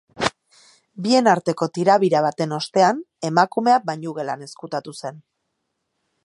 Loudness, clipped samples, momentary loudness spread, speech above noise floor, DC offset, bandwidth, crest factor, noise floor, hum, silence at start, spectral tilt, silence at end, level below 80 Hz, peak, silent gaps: -20 LUFS; under 0.1%; 14 LU; 56 dB; under 0.1%; 11.5 kHz; 20 dB; -76 dBFS; none; 0.15 s; -5 dB/octave; 1.05 s; -64 dBFS; -2 dBFS; none